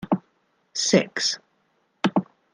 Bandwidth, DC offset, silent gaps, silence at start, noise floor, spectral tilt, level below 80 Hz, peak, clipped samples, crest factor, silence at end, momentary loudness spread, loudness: 10.5 kHz; under 0.1%; none; 0 s; -68 dBFS; -3.5 dB/octave; -68 dBFS; -4 dBFS; under 0.1%; 22 dB; 0.3 s; 9 LU; -24 LUFS